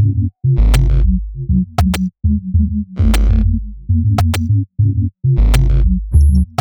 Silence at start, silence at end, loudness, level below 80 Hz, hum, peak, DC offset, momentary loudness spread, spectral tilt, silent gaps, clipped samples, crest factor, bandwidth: 0 s; 0.15 s; -15 LUFS; -16 dBFS; none; 0 dBFS; under 0.1%; 5 LU; -7 dB/octave; none; under 0.1%; 12 dB; 18.5 kHz